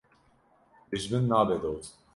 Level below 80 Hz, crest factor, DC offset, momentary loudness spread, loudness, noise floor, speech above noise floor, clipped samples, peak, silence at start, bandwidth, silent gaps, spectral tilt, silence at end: -56 dBFS; 20 dB; under 0.1%; 12 LU; -29 LUFS; -64 dBFS; 37 dB; under 0.1%; -10 dBFS; 0.9 s; 11.5 kHz; none; -6.5 dB/octave; 0.25 s